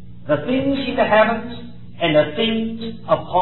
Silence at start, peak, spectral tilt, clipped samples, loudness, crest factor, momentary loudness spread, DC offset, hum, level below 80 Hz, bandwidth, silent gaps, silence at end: 0 s; -2 dBFS; -9.5 dB/octave; under 0.1%; -19 LUFS; 16 dB; 15 LU; 2%; none; -46 dBFS; 4.2 kHz; none; 0 s